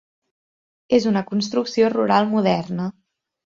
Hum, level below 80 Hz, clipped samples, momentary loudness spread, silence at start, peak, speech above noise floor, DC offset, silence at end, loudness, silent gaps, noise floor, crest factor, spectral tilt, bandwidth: none; -62 dBFS; under 0.1%; 9 LU; 0.9 s; -4 dBFS; over 71 dB; under 0.1%; 0.7 s; -20 LUFS; none; under -90 dBFS; 18 dB; -6 dB/octave; 7.6 kHz